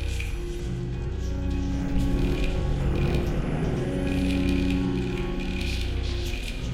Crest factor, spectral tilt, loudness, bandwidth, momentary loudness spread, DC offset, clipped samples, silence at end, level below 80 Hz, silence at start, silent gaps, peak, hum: 14 dB; -6.5 dB/octave; -28 LUFS; 14.5 kHz; 7 LU; under 0.1%; under 0.1%; 0 s; -30 dBFS; 0 s; none; -12 dBFS; none